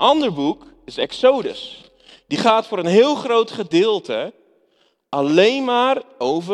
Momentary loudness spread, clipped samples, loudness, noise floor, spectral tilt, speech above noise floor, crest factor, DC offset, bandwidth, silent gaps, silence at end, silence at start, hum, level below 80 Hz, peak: 13 LU; under 0.1%; -18 LUFS; -62 dBFS; -5 dB/octave; 44 dB; 18 dB; under 0.1%; 10.5 kHz; none; 0 s; 0 s; none; -62 dBFS; -2 dBFS